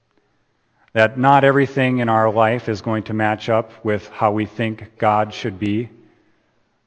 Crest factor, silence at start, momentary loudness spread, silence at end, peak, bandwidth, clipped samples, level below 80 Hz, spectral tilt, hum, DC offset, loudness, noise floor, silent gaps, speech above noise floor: 20 dB; 0.95 s; 11 LU; 1 s; 0 dBFS; 8.8 kHz; under 0.1%; -60 dBFS; -7.5 dB/octave; none; under 0.1%; -18 LUFS; -64 dBFS; none; 46 dB